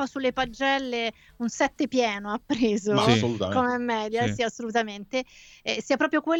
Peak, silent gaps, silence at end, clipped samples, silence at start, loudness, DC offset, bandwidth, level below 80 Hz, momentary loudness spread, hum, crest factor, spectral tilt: -6 dBFS; none; 0 s; under 0.1%; 0 s; -26 LUFS; under 0.1%; 16 kHz; -56 dBFS; 9 LU; none; 20 dB; -5 dB/octave